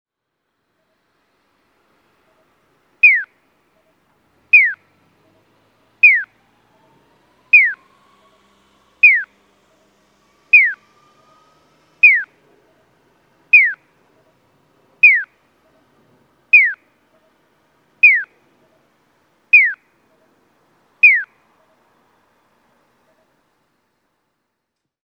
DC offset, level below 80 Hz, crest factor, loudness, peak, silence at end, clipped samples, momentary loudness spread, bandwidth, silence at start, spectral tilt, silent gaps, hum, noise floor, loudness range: under 0.1%; -78 dBFS; 20 dB; -11 LUFS; 0 dBFS; 3.8 s; under 0.1%; 24 LU; 5.4 kHz; 3.05 s; -1.5 dB/octave; none; none; -77 dBFS; 3 LU